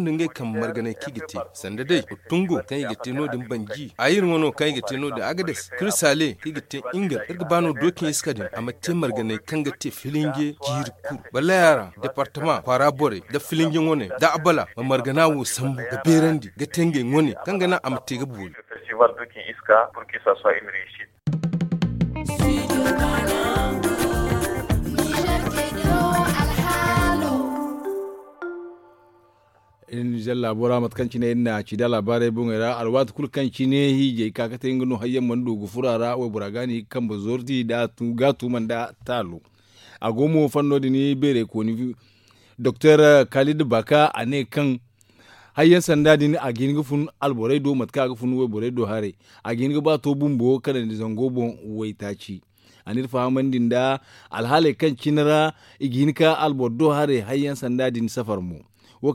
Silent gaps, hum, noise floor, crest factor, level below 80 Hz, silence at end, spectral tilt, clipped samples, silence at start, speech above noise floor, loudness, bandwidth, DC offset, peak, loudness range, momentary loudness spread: none; none; -59 dBFS; 20 dB; -40 dBFS; 0 s; -5.5 dB/octave; under 0.1%; 0 s; 37 dB; -22 LUFS; 17 kHz; under 0.1%; -2 dBFS; 6 LU; 12 LU